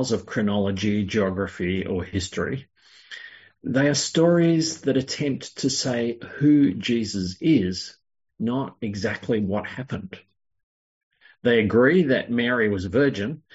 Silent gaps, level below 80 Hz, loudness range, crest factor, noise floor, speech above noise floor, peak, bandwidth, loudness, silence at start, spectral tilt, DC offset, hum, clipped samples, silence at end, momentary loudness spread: 10.63-11.11 s; -60 dBFS; 6 LU; 18 dB; -44 dBFS; 21 dB; -6 dBFS; 8 kHz; -23 LUFS; 0 s; -5 dB/octave; under 0.1%; none; under 0.1%; 0.2 s; 14 LU